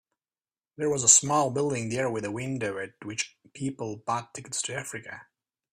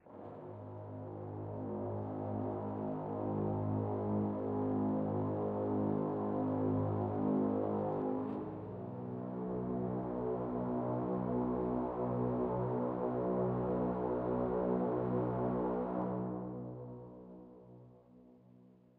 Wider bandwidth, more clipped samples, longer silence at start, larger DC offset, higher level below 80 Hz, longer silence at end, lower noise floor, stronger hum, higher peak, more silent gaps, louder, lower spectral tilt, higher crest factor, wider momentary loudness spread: first, 15.5 kHz vs 4 kHz; neither; first, 0.8 s vs 0.05 s; neither; second, -68 dBFS vs -60 dBFS; first, 0.5 s vs 0.3 s; first, under -90 dBFS vs -62 dBFS; neither; first, -2 dBFS vs -22 dBFS; neither; first, -26 LUFS vs -37 LUFS; second, -3 dB/octave vs -12.5 dB/octave; first, 26 dB vs 14 dB; first, 18 LU vs 12 LU